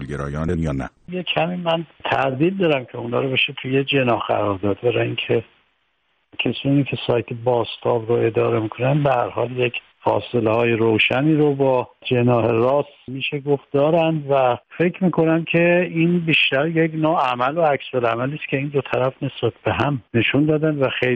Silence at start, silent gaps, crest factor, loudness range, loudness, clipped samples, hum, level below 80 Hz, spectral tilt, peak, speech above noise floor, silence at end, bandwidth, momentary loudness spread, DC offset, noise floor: 0 s; none; 14 dB; 4 LU; -20 LUFS; under 0.1%; none; -50 dBFS; -8 dB/octave; -4 dBFS; 48 dB; 0 s; 8.8 kHz; 7 LU; under 0.1%; -68 dBFS